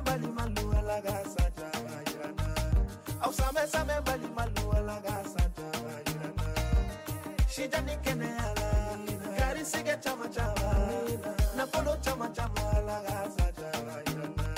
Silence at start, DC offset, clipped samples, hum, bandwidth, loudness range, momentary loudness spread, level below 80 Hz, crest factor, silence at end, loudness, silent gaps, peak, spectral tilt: 0 s; under 0.1%; under 0.1%; none; 16 kHz; 2 LU; 6 LU; -34 dBFS; 14 dB; 0 s; -33 LUFS; none; -18 dBFS; -5 dB/octave